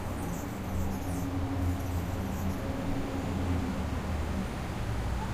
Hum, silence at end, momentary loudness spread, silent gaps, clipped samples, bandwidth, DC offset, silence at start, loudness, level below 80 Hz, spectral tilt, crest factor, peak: none; 0 s; 4 LU; none; under 0.1%; 15.5 kHz; under 0.1%; 0 s; -34 LUFS; -40 dBFS; -6.5 dB/octave; 14 dB; -18 dBFS